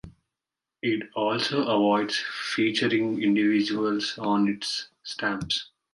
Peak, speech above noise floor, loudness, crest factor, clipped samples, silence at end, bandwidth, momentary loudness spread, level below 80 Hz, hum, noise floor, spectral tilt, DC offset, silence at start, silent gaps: -12 dBFS; 63 dB; -26 LUFS; 16 dB; under 0.1%; 0.3 s; 11.5 kHz; 7 LU; -62 dBFS; none; -88 dBFS; -4.5 dB/octave; under 0.1%; 0.05 s; none